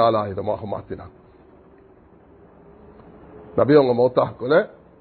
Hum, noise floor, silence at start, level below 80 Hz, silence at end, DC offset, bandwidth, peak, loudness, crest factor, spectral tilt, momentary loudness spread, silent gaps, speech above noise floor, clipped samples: none; -50 dBFS; 0 s; -52 dBFS; 0.35 s; under 0.1%; 4.5 kHz; -2 dBFS; -20 LUFS; 20 dB; -11.5 dB/octave; 17 LU; none; 31 dB; under 0.1%